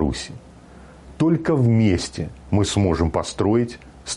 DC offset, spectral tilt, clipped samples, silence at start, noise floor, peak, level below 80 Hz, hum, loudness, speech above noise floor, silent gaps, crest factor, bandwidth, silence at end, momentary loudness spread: under 0.1%; -6 dB/octave; under 0.1%; 0 s; -44 dBFS; -8 dBFS; -38 dBFS; none; -21 LUFS; 24 dB; none; 14 dB; 11.5 kHz; 0 s; 14 LU